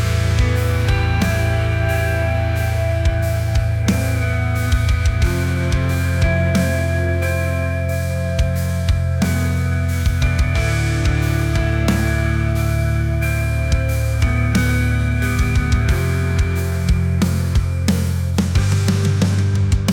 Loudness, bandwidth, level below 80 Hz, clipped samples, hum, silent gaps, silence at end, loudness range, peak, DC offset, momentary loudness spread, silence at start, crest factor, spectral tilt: -18 LUFS; 18 kHz; -24 dBFS; under 0.1%; none; none; 0 s; 1 LU; -4 dBFS; under 0.1%; 2 LU; 0 s; 12 dB; -6 dB/octave